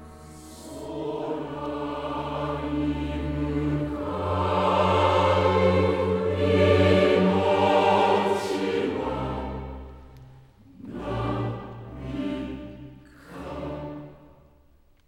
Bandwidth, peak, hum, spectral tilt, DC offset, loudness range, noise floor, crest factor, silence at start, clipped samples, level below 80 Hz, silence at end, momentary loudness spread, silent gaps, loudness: 13 kHz; -8 dBFS; none; -7 dB/octave; under 0.1%; 13 LU; -58 dBFS; 18 dB; 0 s; under 0.1%; -44 dBFS; 0.9 s; 20 LU; none; -24 LUFS